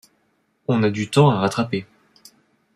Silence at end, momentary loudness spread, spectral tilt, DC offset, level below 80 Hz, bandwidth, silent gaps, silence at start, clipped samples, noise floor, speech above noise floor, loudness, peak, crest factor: 0.95 s; 11 LU; -6.5 dB/octave; under 0.1%; -62 dBFS; 13 kHz; none; 0.7 s; under 0.1%; -66 dBFS; 48 dB; -20 LUFS; -4 dBFS; 18 dB